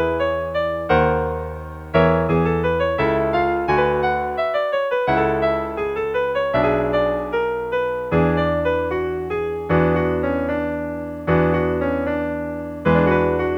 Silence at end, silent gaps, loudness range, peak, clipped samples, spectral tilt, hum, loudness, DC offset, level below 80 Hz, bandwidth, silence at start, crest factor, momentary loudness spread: 0 s; none; 2 LU; -2 dBFS; under 0.1%; -8.5 dB/octave; none; -20 LUFS; under 0.1%; -38 dBFS; 6.4 kHz; 0 s; 18 dB; 7 LU